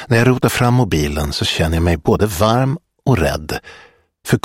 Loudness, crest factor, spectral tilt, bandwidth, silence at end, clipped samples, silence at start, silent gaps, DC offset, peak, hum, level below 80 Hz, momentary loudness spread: -16 LUFS; 16 dB; -5.5 dB/octave; 16.5 kHz; 0.05 s; under 0.1%; 0 s; none; under 0.1%; 0 dBFS; none; -30 dBFS; 9 LU